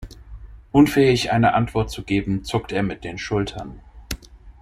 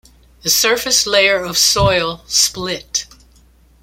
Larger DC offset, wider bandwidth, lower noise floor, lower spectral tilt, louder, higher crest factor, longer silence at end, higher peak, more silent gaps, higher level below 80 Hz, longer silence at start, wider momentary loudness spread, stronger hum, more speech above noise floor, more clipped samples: neither; about the same, 15.5 kHz vs 16.5 kHz; second, -40 dBFS vs -49 dBFS; first, -6 dB/octave vs -1.5 dB/octave; second, -20 LUFS vs -14 LUFS; about the same, 18 dB vs 18 dB; second, 0.1 s vs 0.8 s; second, -4 dBFS vs 0 dBFS; neither; about the same, -40 dBFS vs -38 dBFS; second, 0 s vs 0.45 s; first, 18 LU vs 10 LU; neither; second, 20 dB vs 34 dB; neither